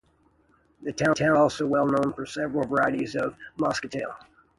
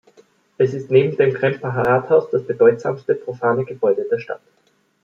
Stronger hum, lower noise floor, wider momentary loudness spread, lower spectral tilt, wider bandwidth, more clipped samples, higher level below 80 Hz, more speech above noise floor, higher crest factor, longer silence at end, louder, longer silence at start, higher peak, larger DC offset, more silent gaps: neither; first, -64 dBFS vs -54 dBFS; first, 13 LU vs 8 LU; second, -5.5 dB/octave vs -8.5 dB/octave; first, 11.5 kHz vs 7 kHz; neither; about the same, -58 dBFS vs -62 dBFS; about the same, 39 dB vs 36 dB; about the same, 18 dB vs 16 dB; second, 0.4 s vs 0.65 s; second, -25 LUFS vs -18 LUFS; first, 0.8 s vs 0.6 s; second, -8 dBFS vs -2 dBFS; neither; neither